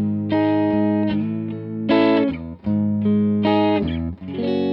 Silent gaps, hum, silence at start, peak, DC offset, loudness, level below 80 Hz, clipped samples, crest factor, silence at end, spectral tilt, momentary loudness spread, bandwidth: none; none; 0 s; -6 dBFS; under 0.1%; -20 LUFS; -44 dBFS; under 0.1%; 14 dB; 0 s; -10 dB/octave; 9 LU; 5.6 kHz